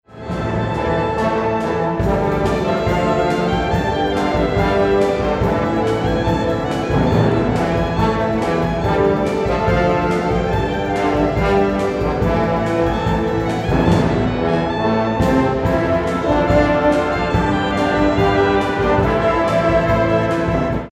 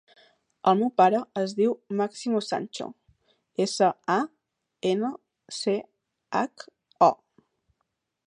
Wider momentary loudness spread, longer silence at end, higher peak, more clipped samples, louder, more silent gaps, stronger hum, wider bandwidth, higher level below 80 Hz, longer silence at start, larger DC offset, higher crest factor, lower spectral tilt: second, 4 LU vs 14 LU; second, 0 s vs 1.15 s; first, -2 dBFS vs -6 dBFS; neither; first, -17 LUFS vs -26 LUFS; neither; neither; first, 14.5 kHz vs 11 kHz; first, -30 dBFS vs -76 dBFS; second, 0.1 s vs 0.65 s; neither; second, 14 dB vs 22 dB; first, -7 dB/octave vs -5 dB/octave